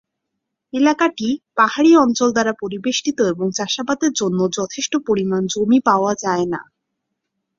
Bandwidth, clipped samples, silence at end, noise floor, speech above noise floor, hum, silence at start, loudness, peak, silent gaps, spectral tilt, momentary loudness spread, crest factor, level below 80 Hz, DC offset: 7.6 kHz; under 0.1%; 0.95 s; -78 dBFS; 61 dB; none; 0.75 s; -18 LUFS; -2 dBFS; none; -4 dB/octave; 9 LU; 16 dB; -60 dBFS; under 0.1%